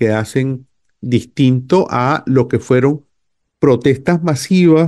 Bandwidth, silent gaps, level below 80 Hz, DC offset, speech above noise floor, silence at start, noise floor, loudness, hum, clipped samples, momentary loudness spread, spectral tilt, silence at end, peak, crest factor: 12.5 kHz; none; -50 dBFS; under 0.1%; 57 dB; 0 s; -70 dBFS; -15 LUFS; none; under 0.1%; 7 LU; -7 dB/octave; 0 s; -2 dBFS; 12 dB